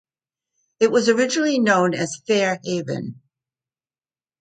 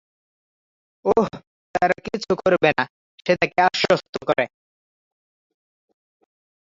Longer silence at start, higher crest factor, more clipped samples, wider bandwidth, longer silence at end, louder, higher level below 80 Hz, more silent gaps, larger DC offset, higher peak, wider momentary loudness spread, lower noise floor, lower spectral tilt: second, 0.8 s vs 1.05 s; about the same, 20 dB vs 22 dB; neither; first, 9.4 kHz vs 7.8 kHz; second, 1.3 s vs 2.3 s; about the same, -20 LUFS vs -21 LUFS; second, -68 dBFS vs -58 dBFS; second, none vs 1.47-1.74 s, 2.90-3.18 s, 4.09-4.13 s; neither; about the same, -2 dBFS vs -2 dBFS; about the same, 10 LU vs 10 LU; about the same, under -90 dBFS vs under -90 dBFS; about the same, -4.5 dB/octave vs -5 dB/octave